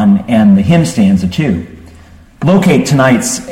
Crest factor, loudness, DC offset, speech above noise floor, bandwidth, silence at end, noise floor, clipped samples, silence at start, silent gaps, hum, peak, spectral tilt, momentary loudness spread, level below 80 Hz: 10 dB; -10 LUFS; under 0.1%; 28 dB; 15.5 kHz; 0 s; -37 dBFS; under 0.1%; 0 s; none; none; 0 dBFS; -6 dB/octave; 8 LU; -38 dBFS